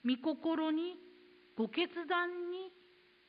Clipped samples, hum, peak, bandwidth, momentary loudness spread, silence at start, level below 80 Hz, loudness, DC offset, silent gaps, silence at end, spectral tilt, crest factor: under 0.1%; none; -20 dBFS; 5 kHz; 14 LU; 0.05 s; -88 dBFS; -37 LUFS; under 0.1%; none; 0.6 s; -2 dB/octave; 18 dB